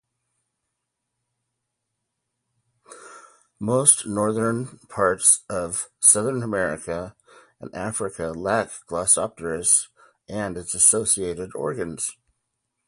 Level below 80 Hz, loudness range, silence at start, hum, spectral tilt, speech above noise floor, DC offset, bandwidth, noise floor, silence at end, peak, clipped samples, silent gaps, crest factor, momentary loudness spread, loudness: -56 dBFS; 6 LU; 2.9 s; none; -3 dB/octave; 57 dB; under 0.1%; 12 kHz; -80 dBFS; 0.75 s; 0 dBFS; under 0.1%; none; 24 dB; 15 LU; -21 LUFS